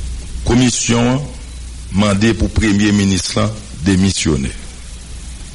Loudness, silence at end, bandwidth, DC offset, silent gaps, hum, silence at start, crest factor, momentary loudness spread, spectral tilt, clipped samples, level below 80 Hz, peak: -15 LUFS; 0 s; 11.5 kHz; under 0.1%; none; none; 0 s; 14 dB; 18 LU; -5 dB/octave; under 0.1%; -28 dBFS; -2 dBFS